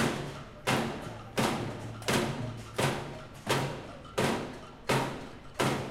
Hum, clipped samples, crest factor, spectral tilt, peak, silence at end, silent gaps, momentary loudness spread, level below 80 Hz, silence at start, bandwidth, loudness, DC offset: none; under 0.1%; 20 dB; -4.5 dB/octave; -14 dBFS; 0 s; none; 11 LU; -54 dBFS; 0 s; 16.5 kHz; -33 LUFS; under 0.1%